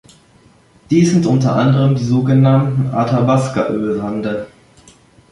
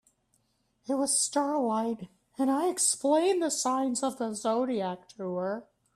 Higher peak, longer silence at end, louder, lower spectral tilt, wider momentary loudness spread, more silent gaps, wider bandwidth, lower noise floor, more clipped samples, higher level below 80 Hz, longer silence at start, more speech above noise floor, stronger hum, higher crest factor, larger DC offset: first, -2 dBFS vs -14 dBFS; first, 0.85 s vs 0.35 s; first, -15 LUFS vs -28 LUFS; first, -7.5 dB/octave vs -3 dB/octave; about the same, 9 LU vs 11 LU; neither; second, 11 kHz vs 14 kHz; second, -49 dBFS vs -73 dBFS; neither; first, -50 dBFS vs -76 dBFS; about the same, 0.9 s vs 0.9 s; second, 35 dB vs 44 dB; neither; about the same, 14 dB vs 16 dB; neither